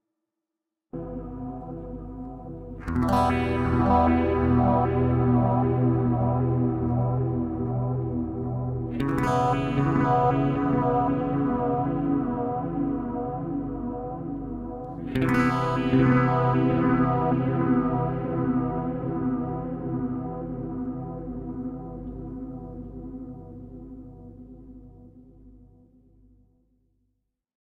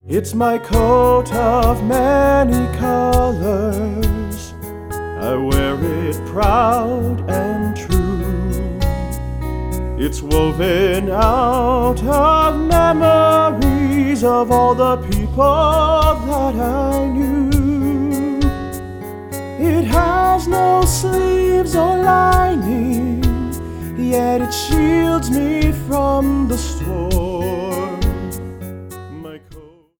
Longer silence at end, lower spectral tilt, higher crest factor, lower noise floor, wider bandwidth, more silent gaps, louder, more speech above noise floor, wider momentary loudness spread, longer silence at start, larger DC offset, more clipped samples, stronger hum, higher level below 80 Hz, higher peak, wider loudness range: first, 2.15 s vs 0.35 s; first, -9 dB/octave vs -6 dB/octave; about the same, 16 dB vs 16 dB; first, -86 dBFS vs -41 dBFS; second, 9.4 kHz vs over 20 kHz; neither; second, -25 LUFS vs -16 LUFS; first, 64 dB vs 26 dB; first, 17 LU vs 12 LU; first, 0.95 s vs 0.05 s; neither; neither; neither; second, -42 dBFS vs -24 dBFS; second, -8 dBFS vs 0 dBFS; first, 14 LU vs 6 LU